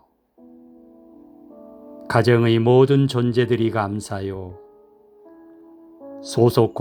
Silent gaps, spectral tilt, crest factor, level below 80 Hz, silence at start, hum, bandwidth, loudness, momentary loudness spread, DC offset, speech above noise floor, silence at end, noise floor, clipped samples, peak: none; -7 dB/octave; 20 dB; -58 dBFS; 1.85 s; none; 16 kHz; -19 LUFS; 21 LU; under 0.1%; 34 dB; 0 s; -52 dBFS; under 0.1%; -2 dBFS